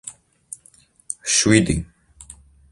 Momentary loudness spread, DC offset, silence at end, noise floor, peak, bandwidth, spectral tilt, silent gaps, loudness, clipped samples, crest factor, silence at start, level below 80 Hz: 27 LU; under 0.1%; 0.5 s; -54 dBFS; 0 dBFS; 11.5 kHz; -3.5 dB/octave; none; -18 LUFS; under 0.1%; 24 dB; 0.05 s; -42 dBFS